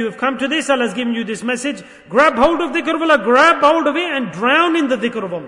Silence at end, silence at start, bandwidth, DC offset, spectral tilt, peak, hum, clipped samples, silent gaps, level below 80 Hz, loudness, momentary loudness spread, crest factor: 0 s; 0 s; 11 kHz; under 0.1%; -4 dB/octave; 0 dBFS; none; under 0.1%; none; -50 dBFS; -15 LUFS; 10 LU; 14 dB